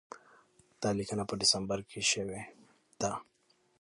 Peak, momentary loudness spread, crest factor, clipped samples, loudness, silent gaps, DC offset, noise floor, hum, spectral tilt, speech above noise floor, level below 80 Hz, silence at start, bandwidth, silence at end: -14 dBFS; 19 LU; 22 dB; under 0.1%; -32 LUFS; none; under 0.1%; -65 dBFS; none; -2.5 dB/octave; 31 dB; -64 dBFS; 0.1 s; 11.5 kHz; 0.6 s